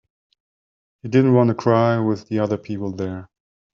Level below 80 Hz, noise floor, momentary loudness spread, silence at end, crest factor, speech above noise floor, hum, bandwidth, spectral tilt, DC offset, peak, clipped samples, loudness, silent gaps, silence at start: -60 dBFS; under -90 dBFS; 13 LU; 0.5 s; 18 dB; over 71 dB; none; 7 kHz; -8 dB/octave; under 0.1%; -4 dBFS; under 0.1%; -20 LUFS; none; 1.05 s